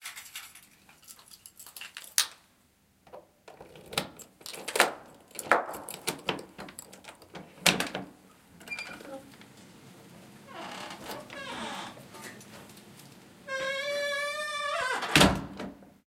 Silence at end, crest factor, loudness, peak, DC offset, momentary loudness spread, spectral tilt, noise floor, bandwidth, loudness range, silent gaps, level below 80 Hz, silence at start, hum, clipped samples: 0.15 s; 32 dB; -30 LUFS; -2 dBFS; under 0.1%; 25 LU; -2.5 dB/octave; -66 dBFS; 17 kHz; 13 LU; none; -56 dBFS; 0 s; none; under 0.1%